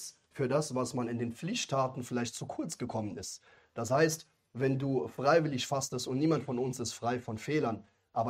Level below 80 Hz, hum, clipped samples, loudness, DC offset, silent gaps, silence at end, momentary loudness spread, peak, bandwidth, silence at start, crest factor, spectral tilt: -70 dBFS; none; under 0.1%; -33 LUFS; under 0.1%; none; 0 s; 12 LU; -14 dBFS; 16 kHz; 0 s; 20 dB; -5 dB/octave